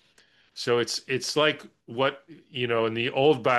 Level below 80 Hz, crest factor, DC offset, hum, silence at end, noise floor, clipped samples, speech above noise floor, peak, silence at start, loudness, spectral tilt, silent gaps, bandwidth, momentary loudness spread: -70 dBFS; 18 dB; under 0.1%; none; 0 s; -62 dBFS; under 0.1%; 36 dB; -8 dBFS; 0.55 s; -26 LUFS; -4 dB/octave; none; 12.5 kHz; 14 LU